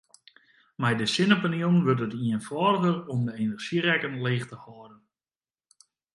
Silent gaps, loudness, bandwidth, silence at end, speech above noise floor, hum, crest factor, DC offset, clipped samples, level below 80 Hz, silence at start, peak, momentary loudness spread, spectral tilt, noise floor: none; -26 LUFS; 11.5 kHz; 1.2 s; over 64 dB; none; 22 dB; under 0.1%; under 0.1%; -68 dBFS; 0.8 s; -4 dBFS; 8 LU; -6 dB/octave; under -90 dBFS